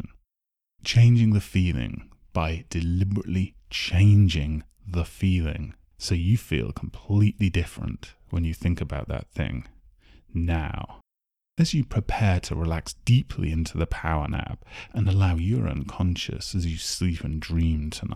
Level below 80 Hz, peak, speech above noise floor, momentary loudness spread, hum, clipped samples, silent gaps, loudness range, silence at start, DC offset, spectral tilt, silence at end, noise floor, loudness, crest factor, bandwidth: -36 dBFS; -8 dBFS; 63 dB; 14 LU; none; under 0.1%; none; 6 LU; 0 s; under 0.1%; -6 dB/octave; 0 s; -87 dBFS; -25 LUFS; 16 dB; 13.5 kHz